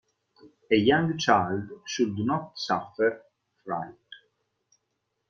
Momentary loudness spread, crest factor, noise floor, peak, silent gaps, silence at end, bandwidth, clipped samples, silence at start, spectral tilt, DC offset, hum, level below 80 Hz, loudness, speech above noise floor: 12 LU; 22 dB; -79 dBFS; -6 dBFS; none; 1.15 s; 7.4 kHz; under 0.1%; 0.45 s; -5 dB/octave; under 0.1%; none; -66 dBFS; -26 LUFS; 53 dB